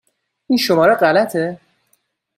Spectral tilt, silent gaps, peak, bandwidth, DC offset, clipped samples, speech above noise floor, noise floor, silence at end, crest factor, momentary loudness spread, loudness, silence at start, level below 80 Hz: -5 dB/octave; none; -2 dBFS; 16.5 kHz; under 0.1%; under 0.1%; 50 dB; -64 dBFS; 0.8 s; 16 dB; 10 LU; -15 LUFS; 0.5 s; -62 dBFS